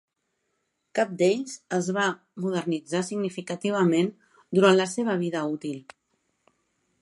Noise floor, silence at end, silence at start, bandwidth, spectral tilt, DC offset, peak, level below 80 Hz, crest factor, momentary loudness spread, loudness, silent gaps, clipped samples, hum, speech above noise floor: -77 dBFS; 1.2 s; 0.95 s; 11.5 kHz; -5.5 dB/octave; under 0.1%; -6 dBFS; -76 dBFS; 22 dB; 10 LU; -26 LUFS; none; under 0.1%; none; 52 dB